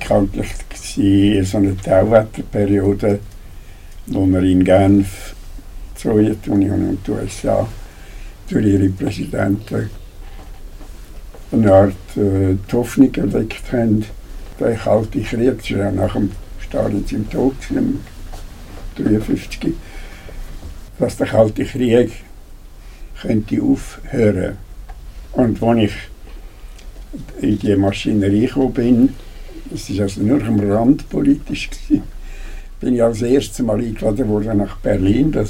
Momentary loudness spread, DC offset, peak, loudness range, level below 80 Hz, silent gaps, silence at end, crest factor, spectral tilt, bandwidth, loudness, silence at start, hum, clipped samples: 22 LU; under 0.1%; 0 dBFS; 5 LU; -32 dBFS; none; 0 s; 18 dB; -7.5 dB/octave; 16 kHz; -17 LUFS; 0 s; none; under 0.1%